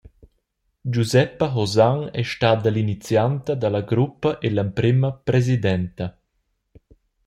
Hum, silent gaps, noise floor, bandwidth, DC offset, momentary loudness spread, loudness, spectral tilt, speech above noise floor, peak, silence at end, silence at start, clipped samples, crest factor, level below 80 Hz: none; none; -72 dBFS; 12.5 kHz; under 0.1%; 7 LU; -21 LUFS; -7 dB/octave; 52 dB; -4 dBFS; 1.15 s; 0.85 s; under 0.1%; 18 dB; -52 dBFS